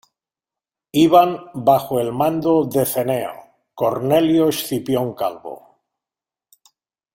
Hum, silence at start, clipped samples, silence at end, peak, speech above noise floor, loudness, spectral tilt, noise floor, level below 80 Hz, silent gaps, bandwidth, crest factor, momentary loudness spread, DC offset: none; 0.95 s; under 0.1%; 1.55 s; -2 dBFS; 72 dB; -18 LUFS; -6 dB/octave; -89 dBFS; -58 dBFS; none; 16.5 kHz; 18 dB; 12 LU; under 0.1%